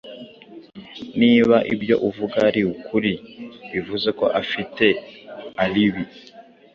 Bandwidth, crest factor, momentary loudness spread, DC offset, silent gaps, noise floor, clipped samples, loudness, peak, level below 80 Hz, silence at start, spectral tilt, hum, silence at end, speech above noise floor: 6.8 kHz; 20 dB; 22 LU; under 0.1%; none; -43 dBFS; under 0.1%; -20 LUFS; -2 dBFS; -56 dBFS; 0.05 s; -7 dB/octave; none; 0.35 s; 24 dB